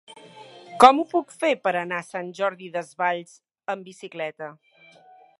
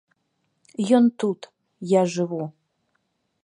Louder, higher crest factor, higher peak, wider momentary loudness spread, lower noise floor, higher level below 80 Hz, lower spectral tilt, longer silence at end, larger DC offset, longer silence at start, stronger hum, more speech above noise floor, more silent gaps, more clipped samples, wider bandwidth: about the same, -23 LUFS vs -22 LUFS; about the same, 24 dB vs 20 dB; first, 0 dBFS vs -6 dBFS; first, 22 LU vs 18 LU; second, -52 dBFS vs -73 dBFS; first, -66 dBFS vs -76 dBFS; second, -4 dB/octave vs -6.5 dB/octave; about the same, 0.9 s vs 0.95 s; neither; second, 0.1 s vs 0.8 s; neither; second, 29 dB vs 52 dB; neither; neither; about the same, 11.5 kHz vs 10.5 kHz